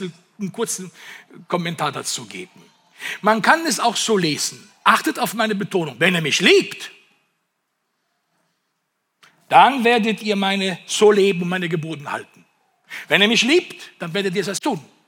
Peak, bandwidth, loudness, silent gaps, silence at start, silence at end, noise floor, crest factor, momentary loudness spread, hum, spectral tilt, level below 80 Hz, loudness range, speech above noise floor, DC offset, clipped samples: 0 dBFS; 17.5 kHz; -18 LUFS; none; 0 s; 0.25 s; -73 dBFS; 20 dB; 18 LU; none; -3.5 dB/octave; -74 dBFS; 5 LU; 54 dB; under 0.1%; under 0.1%